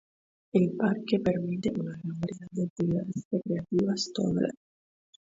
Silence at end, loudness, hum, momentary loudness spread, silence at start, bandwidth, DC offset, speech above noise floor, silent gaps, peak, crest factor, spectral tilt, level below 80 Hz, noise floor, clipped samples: 0.8 s; -30 LUFS; none; 8 LU; 0.55 s; 7.8 kHz; under 0.1%; over 61 dB; 2.70-2.76 s, 3.25-3.31 s; -12 dBFS; 18 dB; -6.5 dB/octave; -62 dBFS; under -90 dBFS; under 0.1%